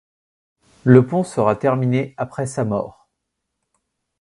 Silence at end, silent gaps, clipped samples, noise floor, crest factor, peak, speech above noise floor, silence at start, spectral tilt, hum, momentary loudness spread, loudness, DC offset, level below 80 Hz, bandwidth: 1.3 s; none; under 0.1%; -77 dBFS; 20 dB; 0 dBFS; 60 dB; 0.85 s; -8 dB/octave; none; 12 LU; -19 LUFS; under 0.1%; -56 dBFS; 11.5 kHz